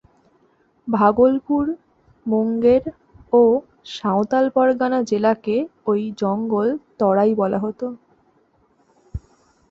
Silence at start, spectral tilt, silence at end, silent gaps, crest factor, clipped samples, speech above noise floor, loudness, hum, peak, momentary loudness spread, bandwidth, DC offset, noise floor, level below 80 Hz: 0.85 s; -7.5 dB/octave; 0.55 s; none; 18 dB; under 0.1%; 42 dB; -19 LUFS; none; -2 dBFS; 17 LU; 7.6 kHz; under 0.1%; -60 dBFS; -50 dBFS